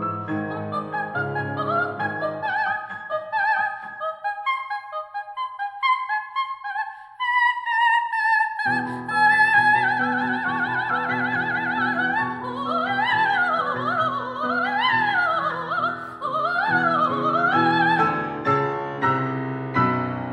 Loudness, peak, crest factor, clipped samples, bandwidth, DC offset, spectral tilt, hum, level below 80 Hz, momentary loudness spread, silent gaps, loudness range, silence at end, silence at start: -22 LUFS; -6 dBFS; 16 dB; under 0.1%; 11 kHz; under 0.1%; -6 dB/octave; none; -66 dBFS; 10 LU; none; 7 LU; 0 s; 0 s